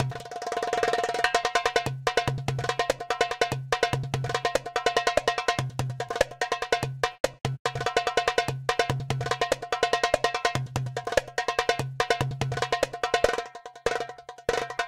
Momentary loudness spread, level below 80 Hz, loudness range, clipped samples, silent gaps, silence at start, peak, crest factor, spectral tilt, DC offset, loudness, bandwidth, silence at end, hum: 6 LU; -50 dBFS; 1 LU; under 0.1%; 7.20-7.24 s, 7.59-7.65 s; 0 s; -6 dBFS; 22 dB; -4 dB/octave; under 0.1%; -27 LUFS; 16 kHz; 0 s; none